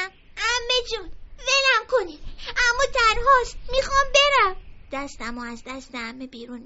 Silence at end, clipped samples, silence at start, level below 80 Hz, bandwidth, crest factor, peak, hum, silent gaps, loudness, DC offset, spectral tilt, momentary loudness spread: 0 s; under 0.1%; 0 s; -38 dBFS; 8 kHz; 18 dB; -4 dBFS; none; none; -20 LUFS; under 0.1%; 1 dB/octave; 18 LU